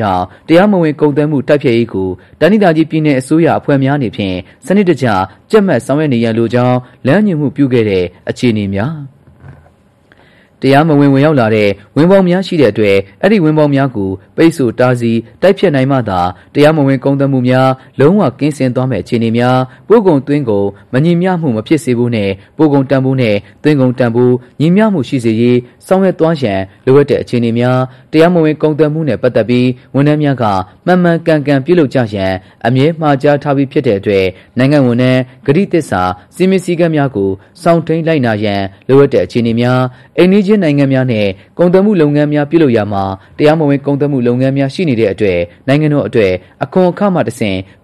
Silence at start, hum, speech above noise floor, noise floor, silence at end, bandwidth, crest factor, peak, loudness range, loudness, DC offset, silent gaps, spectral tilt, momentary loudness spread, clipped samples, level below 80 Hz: 0 s; none; 36 dB; -47 dBFS; 0.2 s; 12.5 kHz; 10 dB; 0 dBFS; 2 LU; -11 LUFS; 0.2%; none; -8 dB/octave; 7 LU; under 0.1%; -48 dBFS